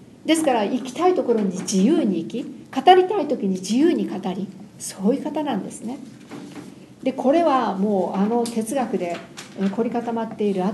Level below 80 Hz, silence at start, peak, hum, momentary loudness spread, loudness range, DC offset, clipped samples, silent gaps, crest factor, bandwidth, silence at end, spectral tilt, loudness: -66 dBFS; 0 s; 0 dBFS; none; 15 LU; 5 LU; under 0.1%; under 0.1%; none; 22 dB; 12.5 kHz; 0 s; -5.5 dB/octave; -21 LUFS